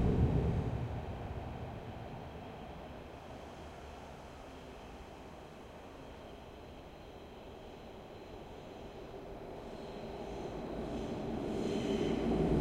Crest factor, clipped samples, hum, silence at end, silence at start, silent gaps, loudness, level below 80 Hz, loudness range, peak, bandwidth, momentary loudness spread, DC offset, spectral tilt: 20 dB; under 0.1%; none; 0 s; 0 s; none; -41 LUFS; -48 dBFS; 12 LU; -20 dBFS; 15.5 kHz; 17 LU; under 0.1%; -7.5 dB/octave